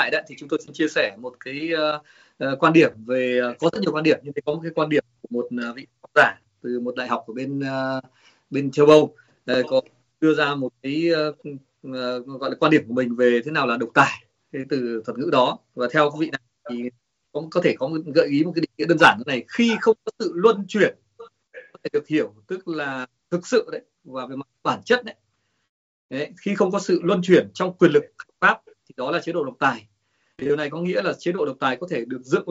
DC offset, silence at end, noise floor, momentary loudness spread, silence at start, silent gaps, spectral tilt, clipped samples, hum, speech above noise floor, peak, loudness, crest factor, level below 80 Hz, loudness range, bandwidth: under 0.1%; 0 s; -64 dBFS; 15 LU; 0 s; 25.69-26.09 s; -4 dB/octave; under 0.1%; none; 43 dB; -2 dBFS; -22 LUFS; 20 dB; -68 dBFS; 6 LU; 8 kHz